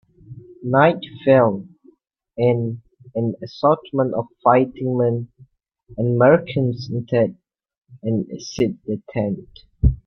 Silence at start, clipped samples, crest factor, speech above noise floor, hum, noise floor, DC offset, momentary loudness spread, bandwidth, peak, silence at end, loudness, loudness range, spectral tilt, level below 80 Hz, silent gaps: 0.3 s; under 0.1%; 18 dB; 36 dB; none; -55 dBFS; under 0.1%; 15 LU; 6.6 kHz; -2 dBFS; 0.1 s; -20 LUFS; 3 LU; -8 dB/octave; -34 dBFS; 7.78-7.82 s